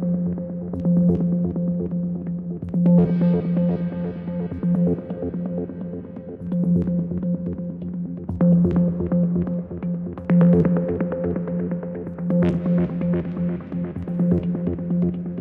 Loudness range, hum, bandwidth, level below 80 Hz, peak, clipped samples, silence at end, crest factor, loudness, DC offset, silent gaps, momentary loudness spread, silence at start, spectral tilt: 5 LU; none; 3 kHz; -46 dBFS; -6 dBFS; under 0.1%; 0 s; 16 dB; -22 LUFS; under 0.1%; none; 11 LU; 0 s; -12.5 dB/octave